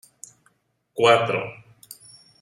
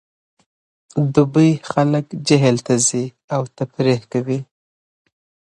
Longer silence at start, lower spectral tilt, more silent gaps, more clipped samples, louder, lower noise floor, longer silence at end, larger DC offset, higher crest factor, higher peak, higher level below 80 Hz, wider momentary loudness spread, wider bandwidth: about the same, 0.95 s vs 0.95 s; second, -4 dB/octave vs -5.5 dB/octave; second, none vs 3.24-3.28 s; neither; about the same, -20 LUFS vs -18 LUFS; second, -66 dBFS vs under -90 dBFS; second, 0.85 s vs 1.15 s; neither; about the same, 22 dB vs 20 dB; about the same, -2 dBFS vs 0 dBFS; second, -68 dBFS vs -58 dBFS; first, 26 LU vs 10 LU; first, 14.5 kHz vs 11.5 kHz